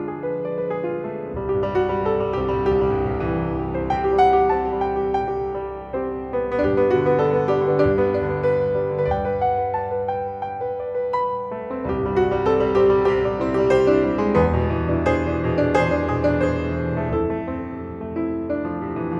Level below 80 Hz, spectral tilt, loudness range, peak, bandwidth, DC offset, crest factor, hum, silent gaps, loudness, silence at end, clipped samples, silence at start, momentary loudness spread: -38 dBFS; -8.5 dB/octave; 4 LU; -4 dBFS; 7.4 kHz; under 0.1%; 16 dB; none; none; -21 LUFS; 0 s; under 0.1%; 0 s; 10 LU